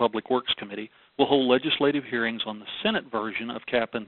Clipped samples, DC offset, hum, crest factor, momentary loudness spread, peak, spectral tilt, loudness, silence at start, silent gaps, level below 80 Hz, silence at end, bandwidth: under 0.1%; under 0.1%; none; 20 dB; 10 LU; -6 dBFS; -8.5 dB/octave; -26 LUFS; 0 s; none; -64 dBFS; 0 s; 4.3 kHz